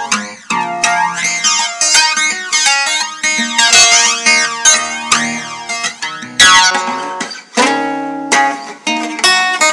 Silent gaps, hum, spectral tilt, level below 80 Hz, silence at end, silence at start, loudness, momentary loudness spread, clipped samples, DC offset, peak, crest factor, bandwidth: none; none; 0.5 dB/octave; -52 dBFS; 0 s; 0 s; -10 LUFS; 13 LU; 0.3%; under 0.1%; 0 dBFS; 12 dB; 12 kHz